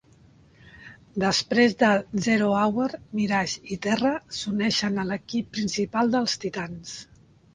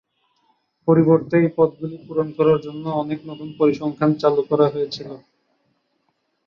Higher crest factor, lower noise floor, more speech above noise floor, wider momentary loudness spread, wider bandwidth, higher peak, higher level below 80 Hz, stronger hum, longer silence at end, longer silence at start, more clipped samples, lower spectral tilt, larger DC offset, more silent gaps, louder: about the same, 20 dB vs 18 dB; second, -55 dBFS vs -70 dBFS; second, 31 dB vs 51 dB; second, 10 LU vs 14 LU; first, 9.8 kHz vs 6.8 kHz; second, -6 dBFS vs -2 dBFS; about the same, -58 dBFS vs -60 dBFS; neither; second, 0.5 s vs 1.3 s; about the same, 0.75 s vs 0.85 s; neither; second, -4.5 dB/octave vs -9 dB/octave; neither; neither; second, -24 LUFS vs -20 LUFS